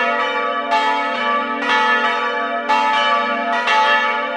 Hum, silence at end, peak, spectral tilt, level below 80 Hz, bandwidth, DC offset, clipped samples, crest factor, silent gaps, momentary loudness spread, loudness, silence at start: none; 0 s; -2 dBFS; -2 dB/octave; -72 dBFS; 10.5 kHz; under 0.1%; under 0.1%; 14 dB; none; 5 LU; -16 LUFS; 0 s